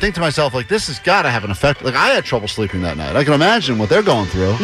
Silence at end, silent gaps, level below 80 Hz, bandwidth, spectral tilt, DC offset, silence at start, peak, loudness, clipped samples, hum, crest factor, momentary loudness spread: 0 s; none; -36 dBFS; 14.5 kHz; -5 dB/octave; under 0.1%; 0 s; -4 dBFS; -16 LUFS; under 0.1%; none; 12 dB; 7 LU